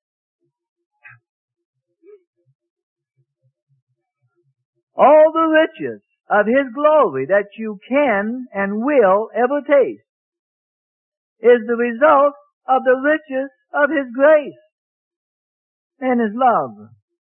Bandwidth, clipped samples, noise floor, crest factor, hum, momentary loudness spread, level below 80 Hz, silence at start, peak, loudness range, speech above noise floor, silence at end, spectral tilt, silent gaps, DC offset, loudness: 3.5 kHz; under 0.1%; -70 dBFS; 18 dB; none; 13 LU; -68 dBFS; 4.95 s; 0 dBFS; 4 LU; 54 dB; 0.55 s; -10 dB/octave; 10.09-10.32 s, 10.39-11.36 s, 12.53-12.61 s, 14.72-15.90 s; under 0.1%; -16 LUFS